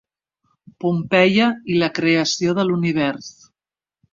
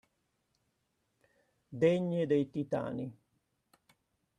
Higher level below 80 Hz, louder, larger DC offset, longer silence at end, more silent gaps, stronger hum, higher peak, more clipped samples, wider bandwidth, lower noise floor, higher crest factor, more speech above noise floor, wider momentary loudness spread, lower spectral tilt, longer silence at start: first, -60 dBFS vs -74 dBFS; first, -18 LUFS vs -33 LUFS; neither; second, 0.8 s vs 1.25 s; neither; neither; first, -2 dBFS vs -14 dBFS; neither; second, 7.6 kHz vs 10 kHz; first, under -90 dBFS vs -80 dBFS; about the same, 18 dB vs 22 dB; first, over 72 dB vs 48 dB; second, 9 LU vs 14 LU; second, -5 dB/octave vs -8 dB/octave; second, 0.85 s vs 1.7 s